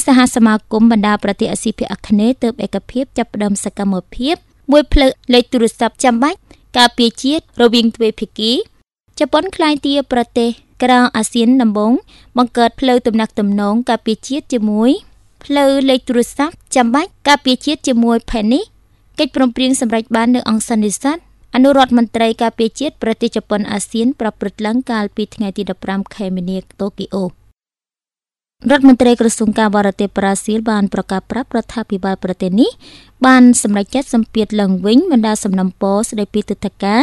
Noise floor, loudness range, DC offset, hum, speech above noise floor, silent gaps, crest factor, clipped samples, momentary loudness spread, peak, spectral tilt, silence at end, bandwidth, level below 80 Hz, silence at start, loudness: under -90 dBFS; 5 LU; under 0.1%; none; over 76 dB; none; 14 dB; under 0.1%; 9 LU; 0 dBFS; -4.5 dB/octave; 0 s; 12.5 kHz; -36 dBFS; 0 s; -14 LUFS